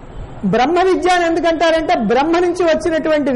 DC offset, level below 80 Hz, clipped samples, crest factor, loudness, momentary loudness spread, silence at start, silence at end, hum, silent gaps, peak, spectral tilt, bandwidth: under 0.1%; -38 dBFS; under 0.1%; 8 dB; -15 LUFS; 3 LU; 0 s; 0 s; none; none; -6 dBFS; -5 dB/octave; 11.5 kHz